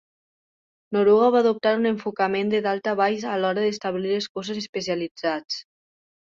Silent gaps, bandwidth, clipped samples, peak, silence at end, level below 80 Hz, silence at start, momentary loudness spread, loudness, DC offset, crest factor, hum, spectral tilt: 4.29-4.35 s, 4.69-4.73 s, 5.11-5.15 s; 7.6 kHz; under 0.1%; -8 dBFS; 0.65 s; -68 dBFS; 0.9 s; 11 LU; -23 LUFS; under 0.1%; 16 dB; none; -5 dB/octave